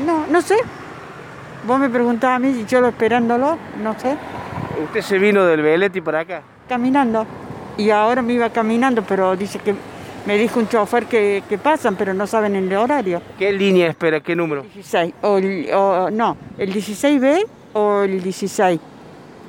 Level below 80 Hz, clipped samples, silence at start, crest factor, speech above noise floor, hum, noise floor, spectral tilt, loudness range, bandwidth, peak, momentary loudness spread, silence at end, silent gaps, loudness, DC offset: -56 dBFS; under 0.1%; 0 s; 14 dB; 22 dB; none; -39 dBFS; -5.5 dB/octave; 1 LU; 17 kHz; -4 dBFS; 11 LU; 0 s; none; -18 LUFS; under 0.1%